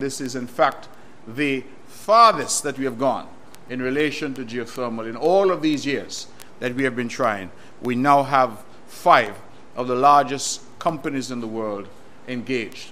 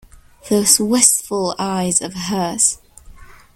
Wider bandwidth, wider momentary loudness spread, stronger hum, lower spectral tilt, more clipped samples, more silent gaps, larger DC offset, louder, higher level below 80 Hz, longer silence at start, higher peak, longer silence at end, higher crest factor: about the same, 16 kHz vs 17 kHz; first, 16 LU vs 10 LU; neither; first, -4 dB/octave vs -2.5 dB/octave; neither; neither; first, 1% vs under 0.1%; second, -21 LUFS vs -15 LUFS; second, -62 dBFS vs -48 dBFS; second, 0 s vs 0.15 s; about the same, 0 dBFS vs 0 dBFS; second, 0 s vs 0.3 s; about the same, 22 dB vs 18 dB